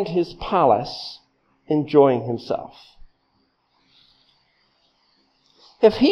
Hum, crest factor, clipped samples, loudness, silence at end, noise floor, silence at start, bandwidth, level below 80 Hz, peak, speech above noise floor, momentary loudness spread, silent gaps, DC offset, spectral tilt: none; 22 dB; under 0.1%; -20 LUFS; 0 s; -67 dBFS; 0 s; 6.6 kHz; -52 dBFS; -2 dBFS; 47 dB; 18 LU; none; under 0.1%; -7.5 dB/octave